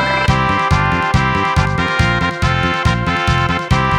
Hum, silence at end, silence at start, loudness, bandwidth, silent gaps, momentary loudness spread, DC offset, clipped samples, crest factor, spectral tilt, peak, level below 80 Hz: none; 0 s; 0 s; -15 LUFS; 12 kHz; none; 2 LU; under 0.1%; under 0.1%; 14 dB; -5.5 dB/octave; -2 dBFS; -26 dBFS